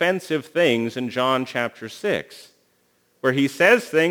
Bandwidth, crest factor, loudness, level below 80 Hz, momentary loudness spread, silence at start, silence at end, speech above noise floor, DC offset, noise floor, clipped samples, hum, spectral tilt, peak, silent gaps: over 20 kHz; 20 dB; -21 LUFS; -72 dBFS; 11 LU; 0 s; 0 s; 43 dB; under 0.1%; -64 dBFS; under 0.1%; 60 Hz at -55 dBFS; -5 dB/octave; -2 dBFS; none